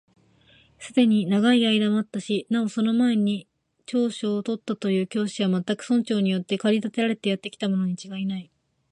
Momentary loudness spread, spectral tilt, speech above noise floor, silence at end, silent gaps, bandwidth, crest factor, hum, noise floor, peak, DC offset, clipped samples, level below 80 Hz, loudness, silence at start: 9 LU; -6 dB/octave; 34 dB; 0.5 s; none; 11 kHz; 16 dB; none; -58 dBFS; -8 dBFS; under 0.1%; under 0.1%; -72 dBFS; -24 LUFS; 0.8 s